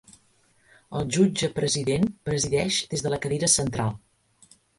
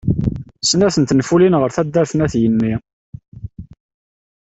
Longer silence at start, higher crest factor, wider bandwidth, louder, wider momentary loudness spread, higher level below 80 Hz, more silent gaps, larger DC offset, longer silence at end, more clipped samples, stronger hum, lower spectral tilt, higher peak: first, 0.9 s vs 0.05 s; first, 20 dB vs 14 dB; first, 11.5 kHz vs 8.2 kHz; second, -25 LUFS vs -16 LUFS; second, 10 LU vs 20 LU; second, -52 dBFS vs -40 dBFS; second, none vs 2.93-3.13 s, 3.28-3.32 s; neither; about the same, 0.8 s vs 0.85 s; neither; neither; second, -4 dB/octave vs -5.5 dB/octave; second, -6 dBFS vs -2 dBFS